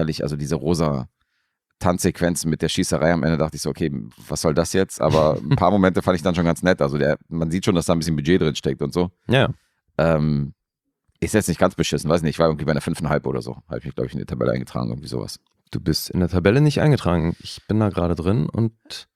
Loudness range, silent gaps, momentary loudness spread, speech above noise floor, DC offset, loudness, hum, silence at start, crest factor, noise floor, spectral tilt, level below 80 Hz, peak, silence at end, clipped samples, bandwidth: 4 LU; none; 11 LU; 59 dB; under 0.1%; -21 LUFS; none; 0 s; 20 dB; -79 dBFS; -6 dB/octave; -44 dBFS; -2 dBFS; 0.15 s; under 0.1%; 15 kHz